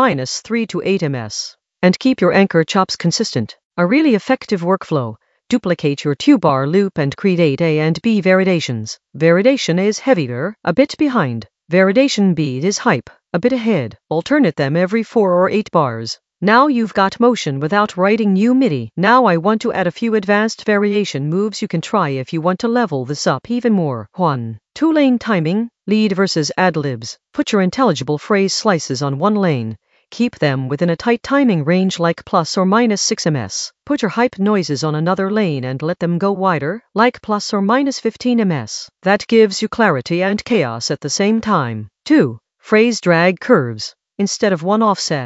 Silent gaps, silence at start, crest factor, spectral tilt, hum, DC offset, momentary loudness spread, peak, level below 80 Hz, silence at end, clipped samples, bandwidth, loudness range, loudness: 3.65-3.70 s; 0 s; 16 dB; -5.5 dB/octave; none; under 0.1%; 8 LU; 0 dBFS; -58 dBFS; 0 s; under 0.1%; 8.2 kHz; 3 LU; -16 LUFS